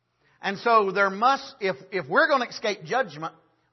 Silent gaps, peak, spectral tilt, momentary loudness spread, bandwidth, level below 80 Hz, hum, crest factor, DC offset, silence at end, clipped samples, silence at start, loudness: none; -8 dBFS; -4 dB/octave; 11 LU; 6.2 kHz; -78 dBFS; none; 18 dB; under 0.1%; 0.45 s; under 0.1%; 0.4 s; -24 LUFS